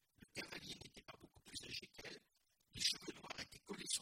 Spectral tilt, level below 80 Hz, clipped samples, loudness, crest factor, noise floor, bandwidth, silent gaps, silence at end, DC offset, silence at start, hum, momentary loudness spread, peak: -1 dB/octave; -74 dBFS; under 0.1%; -47 LUFS; 26 dB; -81 dBFS; 16.5 kHz; none; 0 s; under 0.1%; 0.2 s; none; 19 LU; -24 dBFS